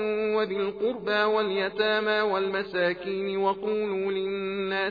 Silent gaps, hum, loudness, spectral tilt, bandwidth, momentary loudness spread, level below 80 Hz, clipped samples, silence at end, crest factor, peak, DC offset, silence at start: none; none; -27 LUFS; -2 dB/octave; 5 kHz; 5 LU; -64 dBFS; under 0.1%; 0 s; 16 dB; -10 dBFS; under 0.1%; 0 s